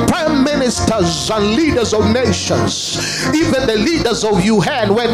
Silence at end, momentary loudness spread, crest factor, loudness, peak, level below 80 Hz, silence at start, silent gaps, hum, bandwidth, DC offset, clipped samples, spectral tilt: 0 s; 2 LU; 14 dB; -14 LUFS; 0 dBFS; -36 dBFS; 0 s; none; none; 15.5 kHz; under 0.1%; under 0.1%; -4.5 dB/octave